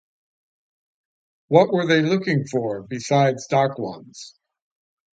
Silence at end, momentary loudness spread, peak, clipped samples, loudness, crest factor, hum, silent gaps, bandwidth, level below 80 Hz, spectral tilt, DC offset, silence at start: 0.85 s; 15 LU; 0 dBFS; under 0.1%; -20 LUFS; 22 dB; none; none; 9.2 kHz; -66 dBFS; -6 dB/octave; under 0.1%; 1.5 s